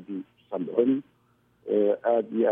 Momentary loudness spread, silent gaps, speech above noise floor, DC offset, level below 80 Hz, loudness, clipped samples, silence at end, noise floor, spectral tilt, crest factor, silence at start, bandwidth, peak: 14 LU; none; 41 dB; under 0.1%; -78 dBFS; -26 LUFS; under 0.1%; 0 s; -65 dBFS; -10 dB/octave; 18 dB; 0 s; 3.7 kHz; -10 dBFS